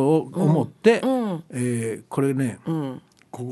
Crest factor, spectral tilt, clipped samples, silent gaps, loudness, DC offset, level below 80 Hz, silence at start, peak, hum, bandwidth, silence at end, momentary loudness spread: 20 dB; -7 dB/octave; under 0.1%; none; -23 LUFS; under 0.1%; -66 dBFS; 0 s; -4 dBFS; none; 12.5 kHz; 0 s; 14 LU